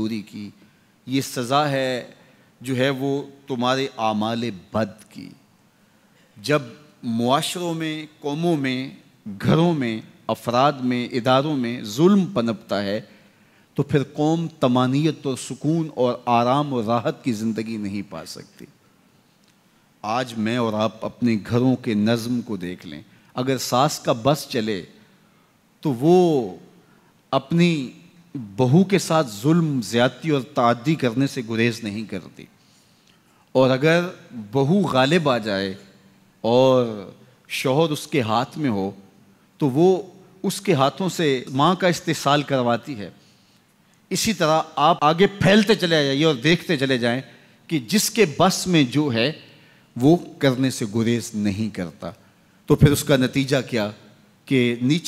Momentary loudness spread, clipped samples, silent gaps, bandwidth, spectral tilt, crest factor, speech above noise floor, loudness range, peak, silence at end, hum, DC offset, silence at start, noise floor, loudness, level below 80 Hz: 14 LU; under 0.1%; none; 16 kHz; -5.5 dB/octave; 18 dB; 38 dB; 5 LU; -4 dBFS; 0 s; none; under 0.1%; 0 s; -58 dBFS; -21 LUFS; -54 dBFS